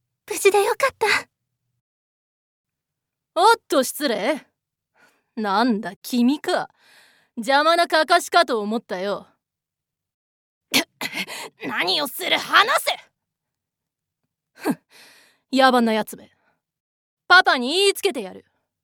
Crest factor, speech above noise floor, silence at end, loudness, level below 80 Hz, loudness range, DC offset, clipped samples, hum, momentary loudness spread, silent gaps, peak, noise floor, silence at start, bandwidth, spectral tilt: 22 dB; 66 dB; 0.45 s; -20 LUFS; -76 dBFS; 5 LU; under 0.1%; under 0.1%; none; 15 LU; 1.81-2.64 s, 5.96-6.02 s, 10.14-10.61 s, 16.80-17.17 s; 0 dBFS; -86 dBFS; 0.3 s; over 20 kHz; -2.5 dB/octave